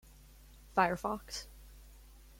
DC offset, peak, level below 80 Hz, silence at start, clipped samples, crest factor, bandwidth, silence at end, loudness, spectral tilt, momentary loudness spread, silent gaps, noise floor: under 0.1%; -14 dBFS; -56 dBFS; 0.5 s; under 0.1%; 26 dB; 16.5 kHz; 0.2 s; -35 LUFS; -4 dB/octave; 25 LU; none; -57 dBFS